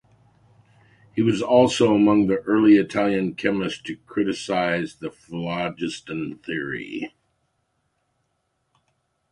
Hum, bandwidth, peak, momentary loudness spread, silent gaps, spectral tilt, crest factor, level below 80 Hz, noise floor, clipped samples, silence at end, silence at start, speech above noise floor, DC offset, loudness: none; 11 kHz; -4 dBFS; 15 LU; none; -6 dB/octave; 20 dB; -58 dBFS; -73 dBFS; under 0.1%; 2.25 s; 1.15 s; 52 dB; under 0.1%; -22 LUFS